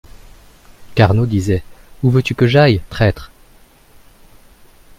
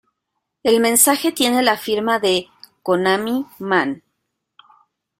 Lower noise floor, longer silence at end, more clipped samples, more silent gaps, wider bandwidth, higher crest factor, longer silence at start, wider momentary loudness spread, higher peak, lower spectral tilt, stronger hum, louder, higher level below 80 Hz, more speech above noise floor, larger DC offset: second, -47 dBFS vs -77 dBFS; first, 1.75 s vs 1.2 s; neither; neither; about the same, 15 kHz vs 16.5 kHz; about the same, 18 dB vs 20 dB; first, 0.8 s vs 0.65 s; about the same, 9 LU vs 11 LU; about the same, 0 dBFS vs 0 dBFS; first, -7.5 dB/octave vs -2.5 dB/octave; neither; about the same, -15 LUFS vs -17 LUFS; first, -38 dBFS vs -62 dBFS; second, 33 dB vs 60 dB; neither